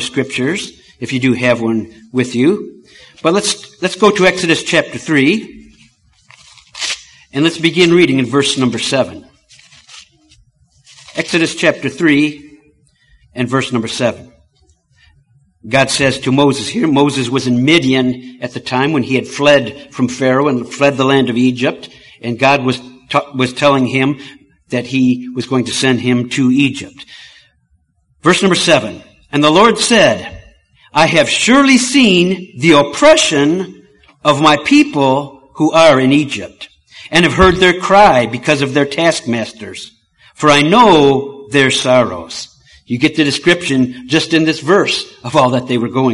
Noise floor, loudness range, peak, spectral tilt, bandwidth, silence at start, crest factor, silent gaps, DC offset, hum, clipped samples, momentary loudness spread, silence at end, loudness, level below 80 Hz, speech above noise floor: -58 dBFS; 6 LU; 0 dBFS; -4.5 dB/octave; 11.5 kHz; 0 s; 14 dB; none; under 0.1%; none; under 0.1%; 13 LU; 0 s; -12 LUFS; -42 dBFS; 46 dB